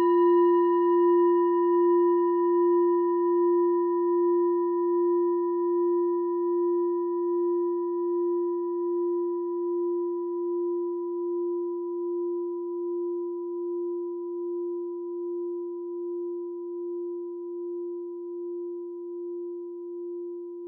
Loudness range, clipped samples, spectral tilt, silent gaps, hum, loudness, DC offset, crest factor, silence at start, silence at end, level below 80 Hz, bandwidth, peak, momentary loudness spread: 12 LU; under 0.1%; -4.5 dB/octave; none; none; -27 LUFS; under 0.1%; 12 dB; 0 s; 0 s; under -90 dBFS; 3 kHz; -14 dBFS; 14 LU